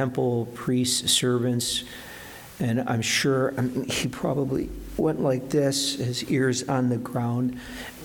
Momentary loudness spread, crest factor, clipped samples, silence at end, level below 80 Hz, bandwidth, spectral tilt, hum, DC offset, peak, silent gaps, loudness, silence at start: 10 LU; 16 dB; under 0.1%; 0 s; -50 dBFS; 19 kHz; -4.5 dB/octave; none; under 0.1%; -10 dBFS; none; -25 LUFS; 0 s